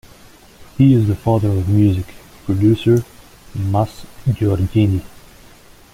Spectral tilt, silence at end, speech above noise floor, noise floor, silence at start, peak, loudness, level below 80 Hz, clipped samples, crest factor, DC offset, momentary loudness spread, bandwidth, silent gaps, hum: -8.5 dB/octave; 0.85 s; 29 dB; -44 dBFS; 0.6 s; -2 dBFS; -17 LUFS; -40 dBFS; under 0.1%; 16 dB; under 0.1%; 16 LU; 15.5 kHz; none; none